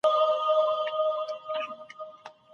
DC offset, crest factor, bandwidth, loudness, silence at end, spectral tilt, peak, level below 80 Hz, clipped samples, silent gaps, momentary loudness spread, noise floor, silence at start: under 0.1%; 16 dB; 7 kHz; -27 LUFS; 0.25 s; -2 dB/octave; -12 dBFS; -84 dBFS; under 0.1%; none; 19 LU; -47 dBFS; 0.05 s